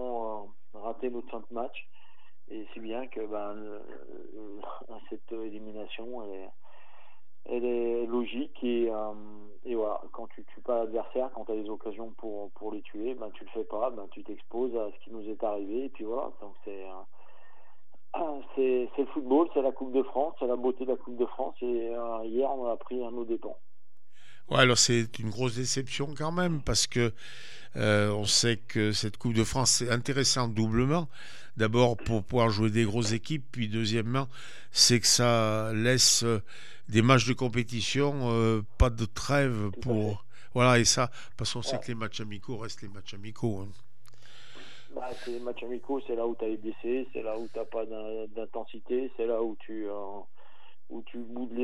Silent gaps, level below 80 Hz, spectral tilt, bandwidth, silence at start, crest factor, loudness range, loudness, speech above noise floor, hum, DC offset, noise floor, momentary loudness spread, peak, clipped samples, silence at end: none; -48 dBFS; -4 dB/octave; 14.5 kHz; 0 s; 24 dB; 14 LU; -29 LUFS; 44 dB; none; 2%; -74 dBFS; 20 LU; -6 dBFS; under 0.1%; 0 s